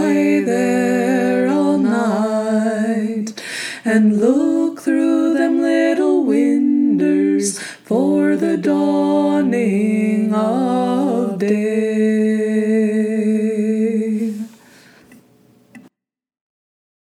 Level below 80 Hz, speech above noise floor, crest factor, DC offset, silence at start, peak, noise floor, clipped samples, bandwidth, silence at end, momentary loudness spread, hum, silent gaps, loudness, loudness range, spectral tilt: -74 dBFS; 65 dB; 14 dB; under 0.1%; 0 s; -2 dBFS; -80 dBFS; under 0.1%; 13.5 kHz; 1.3 s; 5 LU; none; none; -17 LUFS; 4 LU; -6 dB/octave